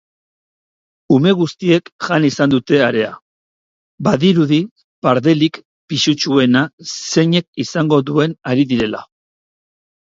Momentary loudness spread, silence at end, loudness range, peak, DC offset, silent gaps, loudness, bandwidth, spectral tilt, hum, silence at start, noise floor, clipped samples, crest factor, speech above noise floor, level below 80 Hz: 9 LU; 1.15 s; 2 LU; 0 dBFS; under 0.1%; 1.92-1.99 s, 3.22-3.98 s, 4.71-4.76 s, 4.84-5.02 s, 5.65-5.88 s, 6.73-6.78 s, 7.48-7.53 s; -15 LUFS; 7.8 kHz; -5.5 dB/octave; none; 1.1 s; under -90 dBFS; under 0.1%; 16 dB; over 75 dB; -54 dBFS